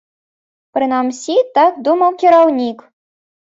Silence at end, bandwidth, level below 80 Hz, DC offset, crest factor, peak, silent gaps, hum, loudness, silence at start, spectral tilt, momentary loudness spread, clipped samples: 0.65 s; 8 kHz; -66 dBFS; under 0.1%; 14 dB; 0 dBFS; none; none; -14 LUFS; 0.75 s; -3.5 dB/octave; 10 LU; under 0.1%